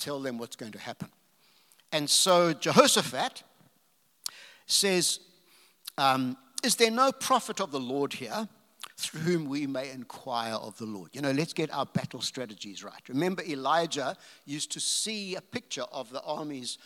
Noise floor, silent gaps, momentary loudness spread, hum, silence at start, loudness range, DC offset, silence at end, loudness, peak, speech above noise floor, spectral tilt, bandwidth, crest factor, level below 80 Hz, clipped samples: -69 dBFS; none; 18 LU; none; 0 s; 7 LU; under 0.1%; 0.1 s; -28 LUFS; -2 dBFS; 40 dB; -3 dB/octave; 18 kHz; 28 dB; -84 dBFS; under 0.1%